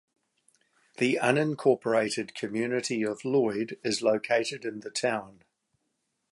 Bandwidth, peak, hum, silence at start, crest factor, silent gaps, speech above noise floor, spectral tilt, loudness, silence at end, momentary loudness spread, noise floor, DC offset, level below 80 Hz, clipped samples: 11.5 kHz; -6 dBFS; none; 1 s; 22 dB; none; 51 dB; -4.5 dB/octave; -28 LUFS; 1 s; 8 LU; -79 dBFS; under 0.1%; -76 dBFS; under 0.1%